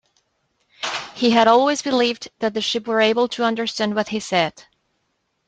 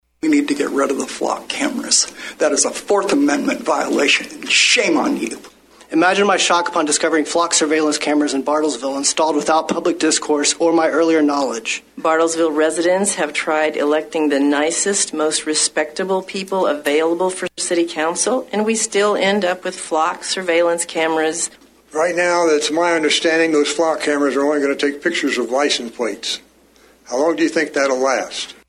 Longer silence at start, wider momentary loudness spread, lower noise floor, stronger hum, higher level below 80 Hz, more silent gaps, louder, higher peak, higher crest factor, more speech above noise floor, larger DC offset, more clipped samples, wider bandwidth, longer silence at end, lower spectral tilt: first, 0.8 s vs 0.25 s; first, 10 LU vs 7 LU; first, -71 dBFS vs -51 dBFS; neither; about the same, -64 dBFS vs -62 dBFS; neither; second, -20 LUFS vs -17 LUFS; about the same, -2 dBFS vs -2 dBFS; about the same, 20 dB vs 16 dB; first, 52 dB vs 33 dB; neither; neither; second, 9.2 kHz vs 13.5 kHz; first, 0.85 s vs 0.15 s; first, -3.5 dB/octave vs -2 dB/octave